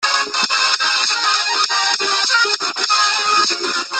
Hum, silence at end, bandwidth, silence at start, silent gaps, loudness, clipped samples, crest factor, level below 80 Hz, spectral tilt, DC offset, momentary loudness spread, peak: none; 0 s; 12 kHz; 0 s; none; -15 LUFS; under 0.1%; 16 dB; -72 dBFS; 2 dB/octave; under 0.1%; 3 LU; -2 dBFS